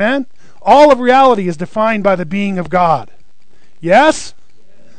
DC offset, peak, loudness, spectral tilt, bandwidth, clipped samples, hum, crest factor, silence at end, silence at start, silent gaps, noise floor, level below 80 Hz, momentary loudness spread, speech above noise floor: 4%; 0 dBFS; -12 LUFS; -5.5 dB/octave; 9.4 kHz; 0.7%; none; 14 dB; 0.7 s; 0 s; none; -55 dBFS; -48 dBFS; 14 LU; 44 dB